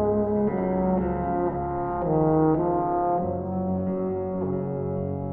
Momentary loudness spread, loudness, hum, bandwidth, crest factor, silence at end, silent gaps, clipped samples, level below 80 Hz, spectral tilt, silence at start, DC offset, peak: 7 LU; -25 LUFS; none; 3 kHz; 16 dB; 0 s; none; under 0.1%; -44 dBFS; -13.5 dB/octave; 0 s; under 0.1%; -10 dBFS